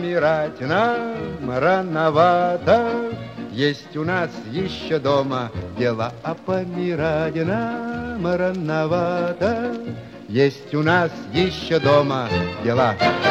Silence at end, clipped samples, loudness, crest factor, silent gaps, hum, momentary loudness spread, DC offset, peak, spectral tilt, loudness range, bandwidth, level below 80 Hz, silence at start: 0 s; under 0.1%; -21 LUFS; 18 dB; none; none; 10 LU; under 0.1%; -4 dBFS; -7 dB/octave; 4 LU; 8.4 kHz; -50 dBFS; 0 s